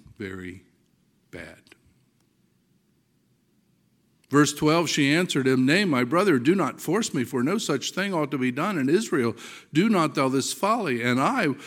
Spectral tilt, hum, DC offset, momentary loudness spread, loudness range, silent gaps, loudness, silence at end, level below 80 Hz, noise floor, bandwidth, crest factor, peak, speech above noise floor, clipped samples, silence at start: -5 dB/octave; none; under 0.1%; 15 LU; 6 LU; none; -23 LUFS; 0 s; -68 dBFS; -67 dBFS; 17 kHz; 20 dB; -6 dBFS; 43 dB; under 0.1%; 0.2 s